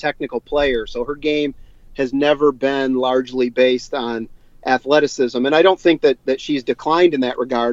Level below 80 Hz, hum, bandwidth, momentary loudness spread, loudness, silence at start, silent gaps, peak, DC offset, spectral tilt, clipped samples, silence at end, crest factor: -44 dBFS; none; 7.8 kHz; 11 LU; -18 LUFS; 0 s; none; -2 dBFS; under 0.1%; -5 dB/octave; under 0.1%; 0 s; 16 dB